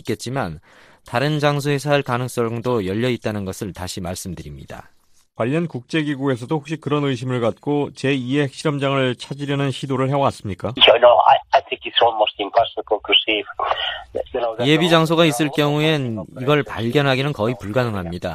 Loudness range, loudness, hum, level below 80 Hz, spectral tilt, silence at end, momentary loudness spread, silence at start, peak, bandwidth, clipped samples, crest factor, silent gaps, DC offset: 9 LU; -19 LUFS; none; -52 dBFS; -5.5 dB/octave; 0 s; 13 LU; 0.05 s; 0 dBFS; 15 kHz; under 0.1%; 20 dB; none; under 0.1%